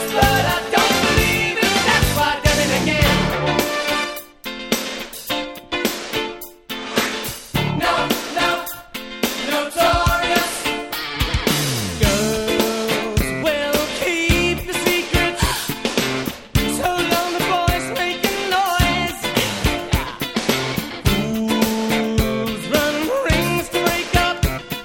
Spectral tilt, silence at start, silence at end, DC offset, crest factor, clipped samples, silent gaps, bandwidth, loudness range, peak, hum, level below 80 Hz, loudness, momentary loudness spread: -4 dB/octave; 0 s; 0 s; under 0.1%; 20 dB; under 0.1%; none; 19 kHz; 5 LU; 0 dBFS; none; -32 dBFS; -19 LUFS; 8 LU